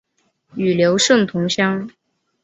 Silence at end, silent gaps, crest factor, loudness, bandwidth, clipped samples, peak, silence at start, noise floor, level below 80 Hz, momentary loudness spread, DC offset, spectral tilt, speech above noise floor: 0.55 s; none; 16 dB; -17 LUFS; 8.4 kHz; under 0.1%; -2 dBFS; 0.55 s; -61 dBFS; -60 dBFS; 15 LU; under 0.1%; -4 dB/octave; 45 dB